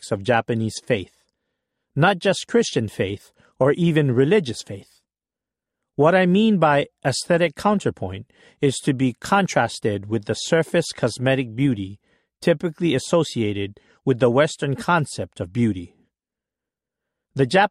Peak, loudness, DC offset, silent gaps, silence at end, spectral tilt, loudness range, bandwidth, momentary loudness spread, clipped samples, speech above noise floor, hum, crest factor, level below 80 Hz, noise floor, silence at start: -4 dBFS; -21 LUFS; under 0.1%; none; 0 s; -5.5 dB/octave; 3 LU; 14 kHz; 12 LU; under 0.1%; 69 dB; none; 18 dB; -58 dBFS; -89 dBFS; 0 s